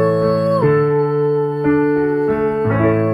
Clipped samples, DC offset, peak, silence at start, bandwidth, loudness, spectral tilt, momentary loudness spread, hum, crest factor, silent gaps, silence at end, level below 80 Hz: under 0.1%; under 0.1%; -4 dBFS; 0 s; 10 kHz; -16 LUFS; -9.5 dB/octave; 3 LU; none; 12 dB; none; 0 s; -46 dBFS